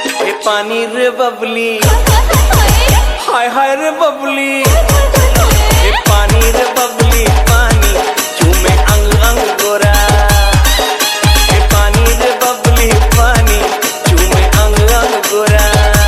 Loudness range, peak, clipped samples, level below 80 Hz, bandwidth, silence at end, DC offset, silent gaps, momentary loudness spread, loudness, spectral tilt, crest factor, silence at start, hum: 1 LU; 0 dBFS; 0.5%; -12 dBFS; 16 kHz; 0 s; under 0.1%; none; 4 LU; -10 LUFS; -4 dB/octave; 8 dB; 0 s; none